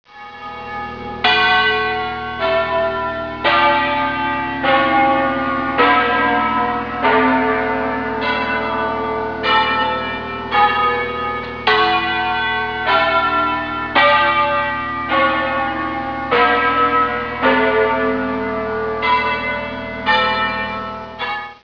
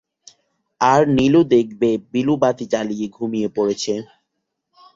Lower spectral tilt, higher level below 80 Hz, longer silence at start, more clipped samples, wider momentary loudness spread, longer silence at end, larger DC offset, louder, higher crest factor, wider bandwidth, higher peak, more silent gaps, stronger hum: about the same, -6 dB/octave vs -6 dB/octave; first, -44 dBFS vs -54 dBFS; second, 0.1 s vs 0.8 s; neither; about the same, 10 LU vs 10 LU; second, 0.1 s vs 0.9 s; first, 0.3% vs under 0.1%; about the same, -16 LUFS vs -18 LUFS; about the same, 16 dB vs 18 dB; second, 5.4 kHz vs 7.8 kHz; about the same, -2 dBFS vs -2 dBFS; neither; neither